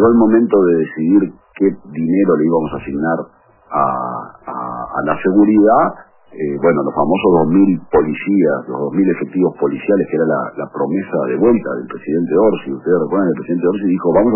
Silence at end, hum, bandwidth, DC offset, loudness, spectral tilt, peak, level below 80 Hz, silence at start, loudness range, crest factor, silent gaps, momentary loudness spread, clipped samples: 0 s; none; 3.1 kHz; under 0.1%; -15 LUFS; -12.5 dB/octave; -2 dBFS; -48 dBFS; 0 s; 4 LU; 14 dB; none; 11 LU; under 0.1%